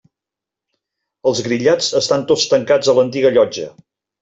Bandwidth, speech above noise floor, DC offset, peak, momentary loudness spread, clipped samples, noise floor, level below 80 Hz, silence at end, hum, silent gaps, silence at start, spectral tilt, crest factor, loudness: 8 kHz; 71 dB; under 0.1%; -2 dBFS; 6 LU; under 0.1%; -86 dBFS; -58 dBFS; 0.5 s; none; none; 1.25 s; -3.5 dB/octave; 16 dB; -15 LUFS